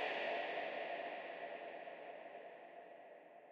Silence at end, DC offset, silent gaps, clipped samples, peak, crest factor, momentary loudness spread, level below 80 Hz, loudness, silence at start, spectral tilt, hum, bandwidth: 0 s; under 0.1%; none; under 0.1%; -30 dBFS; 16 dB; 16 LU; under -90 dBFS; -46 LUFS; 0 s; -4 dB/octave; none; 7.6 kHz